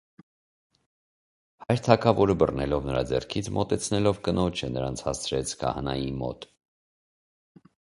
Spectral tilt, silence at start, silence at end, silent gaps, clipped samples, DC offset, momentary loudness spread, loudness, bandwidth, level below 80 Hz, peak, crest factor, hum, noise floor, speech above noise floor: -5.5 dB/octave; 1.6 s; 1.45 s; none; under 0.1%; under 0.1%; 9 LU; -26 LUFS; 11.5 kHz; -46 dBFS; -2 dBFS; 26 dB; none; under -90 dBFS; over 64 dB